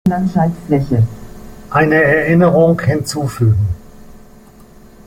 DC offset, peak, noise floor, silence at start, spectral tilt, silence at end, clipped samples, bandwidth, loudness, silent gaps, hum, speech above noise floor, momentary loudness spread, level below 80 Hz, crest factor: under 0.1%; -2 dBFS; -41 dBFS; 0.05 s; -7.5 dB/octave; 0.9 s; under 0.1%; 16 kHz; -14 LUFS; none; none; 28 dB; 9 LU; -38 dBFS; 14 dB